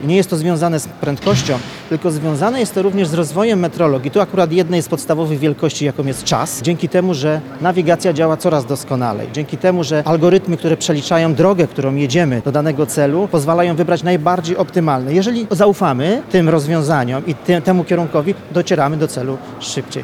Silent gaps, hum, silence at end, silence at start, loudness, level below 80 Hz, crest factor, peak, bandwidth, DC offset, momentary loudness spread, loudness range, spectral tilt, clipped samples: none; none; 0 s; 0 s; -16 LUFS; -52 dBFS; 14 dB; -2 dBFS; 16 kHz; under 0.1%; 6 LU; 2 LU; -6 dB/octave; under 0.1%